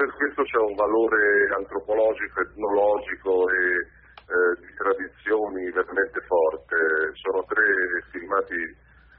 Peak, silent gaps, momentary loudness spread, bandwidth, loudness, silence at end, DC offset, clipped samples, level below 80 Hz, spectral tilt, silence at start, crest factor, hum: -8 dBFS; none; 7 LU; 4.2 kHz; -23 LUFS; 0.45 s; under 0.1%; under 0.1%; -56 dBFS; -2.5 dB/octave; 0 s; 14 dB; none